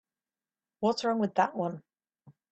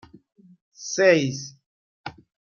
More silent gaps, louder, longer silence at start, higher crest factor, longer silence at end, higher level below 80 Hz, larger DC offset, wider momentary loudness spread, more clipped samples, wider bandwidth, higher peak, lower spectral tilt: second, none vs 1.66-2.04 s; second, -30 LUFS vs -21 LUFS; about the same, 0.8 s vs 0.8 s; about the same, 20 dB vs 22 dB; second, 0.2 s vs 0.45 s; second, -76 dBFS vs -68 dBFS; neither; second, 8 LU vs 22 LU; neither; first, 8.6 kHz vs 7.4 kHz; second, -12 dBFS vs -4 dBFS; about the same, -5.5 dB/octave vs -4.5 dB/octave